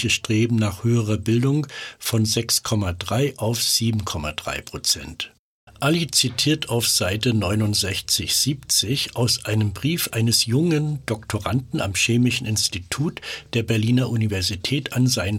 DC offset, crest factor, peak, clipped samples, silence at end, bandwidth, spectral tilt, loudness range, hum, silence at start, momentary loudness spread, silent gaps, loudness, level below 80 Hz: under 0.1%; 16 dB; -6 dBFS; under 0.1%; 0 s; 17 kHz; -4 dB/octave; 2 LU; none; 0 s; 8 LU; 5.39-5.67 s; -21 LUFS; -48 dBFS